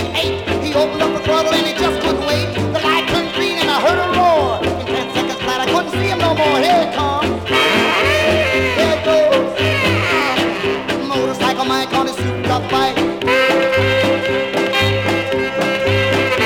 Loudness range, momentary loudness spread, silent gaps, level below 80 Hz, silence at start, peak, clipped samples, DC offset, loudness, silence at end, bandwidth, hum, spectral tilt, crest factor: 2 LU; 5 LU; none; -40 dBFS; 0 s; -2 dBFS; under 0.1%; under 0.1%; -15 LUFS; 0 s; 18 kHz; none; -4.5 dB/octave; 14 dB